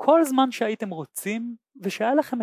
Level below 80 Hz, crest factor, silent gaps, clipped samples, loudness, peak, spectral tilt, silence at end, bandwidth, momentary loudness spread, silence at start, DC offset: -82 dBFS; 20 dB; none; under 0.1%; -25 LUFS; -4 dBFS; -4.5 dB/octave; 0 s; 16 kHz; 13 LU; 0 s; under 0.1%